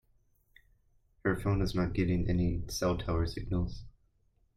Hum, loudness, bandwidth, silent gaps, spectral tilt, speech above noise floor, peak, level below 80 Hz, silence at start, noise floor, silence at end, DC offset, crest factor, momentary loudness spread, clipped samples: none; -33 LUFS; 15 kHz; none; -6.5 dB/octave; 40 dB; -16 dBFS; -44 dBFS; 1.25 s; -70 dBFS; 0.65 s; under 0.1%; 18 dB; 5 LU; under 0.1%